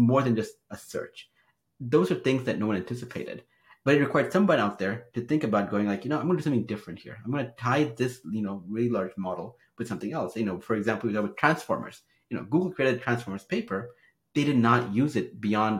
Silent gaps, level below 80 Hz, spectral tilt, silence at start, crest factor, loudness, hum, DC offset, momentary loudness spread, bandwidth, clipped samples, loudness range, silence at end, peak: none; -68 dBFS; -7 dB/octave; 0 s; 24 dB; -28 LUFS; none; under 0.1%; 14 LU; 16 kHz; under 0.1%; 4 LU; 0 s; -4 dBFS